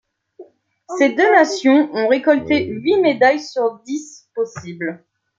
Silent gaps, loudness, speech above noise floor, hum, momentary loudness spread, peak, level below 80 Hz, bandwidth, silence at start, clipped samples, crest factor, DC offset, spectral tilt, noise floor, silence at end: none; -17 LUFS; 28 dB; none; 15 LU; -2 dBFS; -62 dBFS; 7.8 kHz; 0.4 s; under 0.1%; 16 dB; under 0.1%; -4.5 dB/octave; -44 dBFS; 0.4 s